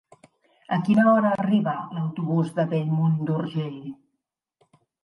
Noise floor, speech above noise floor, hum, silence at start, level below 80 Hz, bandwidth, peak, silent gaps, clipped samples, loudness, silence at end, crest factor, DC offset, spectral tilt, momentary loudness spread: -81 dBFS; 58 dB; none; 0.7 s; -70 dBFS; 11 kHz; -8 dBFS; none; under 0.1%; -23 LUFS; 1.1 s; 16 dB; under 0.1%; -9 dB/octave; 12 LU